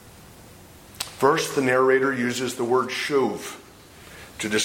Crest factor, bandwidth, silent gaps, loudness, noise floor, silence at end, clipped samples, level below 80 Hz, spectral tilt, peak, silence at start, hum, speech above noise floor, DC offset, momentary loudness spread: 20 dB; 17 kHz; none; -23 LUFS; -47 dBFS; 0 s; under 0.1%; -58 dBFS; -3.5 dB/octave; -4 dBFS; 0.05 s; none; 25 dB; under 0.1%; 20 LU